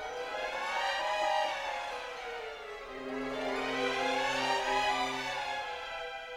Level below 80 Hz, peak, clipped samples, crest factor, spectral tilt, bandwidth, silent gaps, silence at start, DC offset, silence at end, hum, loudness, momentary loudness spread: -62 dBFS; -18 dBFS; under 0.1%; 16 dB; -2 dB/octave; 16 kHz; none; 0 s; under 0.1%; 0 s; none; -34 LUFS; 10 LU